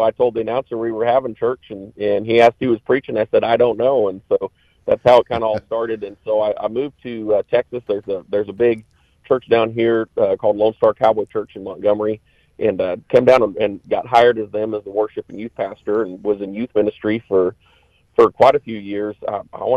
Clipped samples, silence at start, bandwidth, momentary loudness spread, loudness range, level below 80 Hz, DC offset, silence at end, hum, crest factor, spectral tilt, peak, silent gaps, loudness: under 0.1%; 0 s; 8.6 kHz; 12 LU; 4 LU; -54 dBFS; under 0.1%; 0 s; none; 16 dB; -7 dB/octave; -2 dBFS; none; -18 LUFS